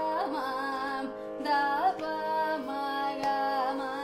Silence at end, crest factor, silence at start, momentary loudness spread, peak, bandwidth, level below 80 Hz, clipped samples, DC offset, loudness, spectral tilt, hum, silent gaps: 0 s; 14 dB; 0 s; 6 LU; -16 dBFS; 15 kHz; -66 dBFS; under 0.1%; under 0.1%; -31 LUFS; -4 dB/octave; none; none